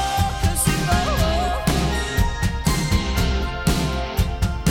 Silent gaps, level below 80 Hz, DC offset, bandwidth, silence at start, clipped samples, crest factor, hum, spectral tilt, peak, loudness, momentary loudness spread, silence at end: none; -24 dBFS; under 0.1%; 17.5 kHz; 0 s; under 0.1%; 16 dB; none; -4.5 dB/octave; -4 dBFS; -21 LUFS; 3 LU; 0 s